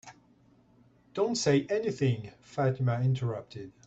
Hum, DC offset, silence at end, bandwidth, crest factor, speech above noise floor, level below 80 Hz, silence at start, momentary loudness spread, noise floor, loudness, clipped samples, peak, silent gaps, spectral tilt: none; under 0.1%; 0.15 s; 8.2 kHz; 16 dB; 33 dB; -66 dBFS; 0.05 s; 13 LU; -63 dBFS; -30 LUFS; under 0.1%; -14 dBFS; none; -6 dB/octave